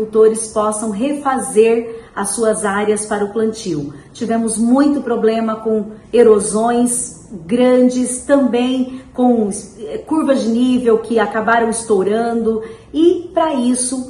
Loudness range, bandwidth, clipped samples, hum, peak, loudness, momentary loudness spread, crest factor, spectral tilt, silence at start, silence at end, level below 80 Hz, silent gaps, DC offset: 3 LU; 13 kHz; under 0.1%; none; 0 dBFS; -15 LUFS; 10 LU; 16 dB; -4.5 dB/octave; 0 s; 0 s; -50 dBFS; none; under 0.1%